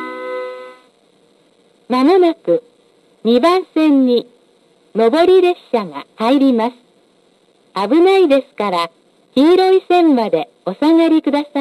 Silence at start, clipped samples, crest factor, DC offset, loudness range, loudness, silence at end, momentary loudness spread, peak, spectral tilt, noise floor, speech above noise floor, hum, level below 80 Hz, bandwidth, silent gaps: 0 s; under 0.1%; 12 dB; under 0.1%; 3 LU; -14 LUFS; 0 s; 14 LU; -2 dBFS; -6 dB/octave; -54 dBFS; 42 dB; none; -62 dBFS; 12 kHz; none